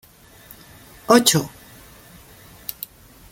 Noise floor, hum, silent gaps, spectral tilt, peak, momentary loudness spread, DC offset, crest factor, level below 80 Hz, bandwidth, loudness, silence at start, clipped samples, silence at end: -47 dBFS; none; none; -3.5 dB/octave; 0 dBFS; 27 LU; under 0.1%; 24 dB; -54 dBFS; 17 kHz; -17 LUFS; 1.1 s; under 0.1%; 1.85 s